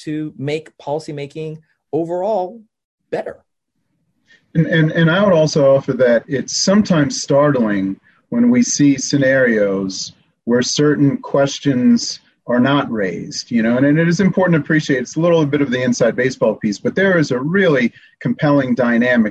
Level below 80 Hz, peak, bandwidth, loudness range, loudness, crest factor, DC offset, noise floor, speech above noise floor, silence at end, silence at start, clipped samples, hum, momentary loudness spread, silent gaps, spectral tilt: -54 dBFS; -4 dBFS; 8.6 kHz; 9 LU; -16 LUFS; 12 dB; under 0.1%; -71 dBFS; 55 dB; 0 s; 0 s; under 0.1%; none; 12 LU; 2.85-2.98 s; -5.5 dB/octave